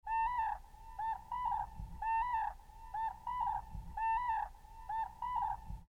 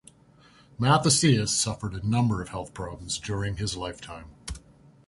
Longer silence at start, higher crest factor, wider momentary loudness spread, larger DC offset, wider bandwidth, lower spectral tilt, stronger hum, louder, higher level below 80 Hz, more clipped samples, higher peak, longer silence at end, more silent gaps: second, 0.05 s vs 0.8 s; second, 12 dB vs 20 dB; second, 12 LU vs 20 LU; neither; first, 15.5 kHz vs 11.5 kHz; about the same, -4.5 dB/octave vs -4 dB/octave; neither; second, -39 LUFS vs -26 LUFS; about the same, -52 dBFS vs -48 dBFS; neither; second, -26 dBFS vs -8 dBFS; second, 0.05 s vs 0.5 s; neither